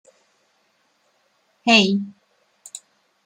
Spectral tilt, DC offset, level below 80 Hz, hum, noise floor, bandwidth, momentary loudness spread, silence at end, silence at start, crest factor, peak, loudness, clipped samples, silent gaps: -3.5 dB/octave; under 0.1%; -68 dBFS; none; -65 dBFS; 10.5 kHz; 24 LU; 1.15 s; 1.65 s; 22 dB; -2 dBFS; -17 LUFS; under 0.1%; none